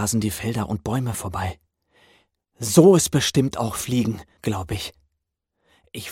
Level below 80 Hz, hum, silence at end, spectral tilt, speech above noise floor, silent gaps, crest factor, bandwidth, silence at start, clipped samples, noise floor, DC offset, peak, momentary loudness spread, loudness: -48 dBFS; none; 0 s; -5 dB/octave; 57 dB; none; 20 dB; 17 kHz; 0 s; under 0.1%; -78 dBFS; under 0.1%; -2 dBFS; 16 LU; -22 LUFS